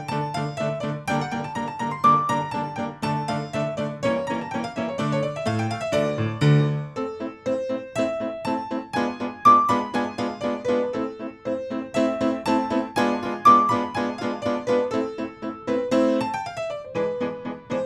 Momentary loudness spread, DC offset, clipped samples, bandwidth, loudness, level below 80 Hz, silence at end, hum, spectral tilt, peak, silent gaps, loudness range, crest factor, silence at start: 11 LU; under 0.1%; under 0.1%; 13 kHz; -24 LUFS; -58 dBFS; 0 s; none; -6.5 dB/octave; -4 dBFS; none; 4 LU; 20 dB; 0 s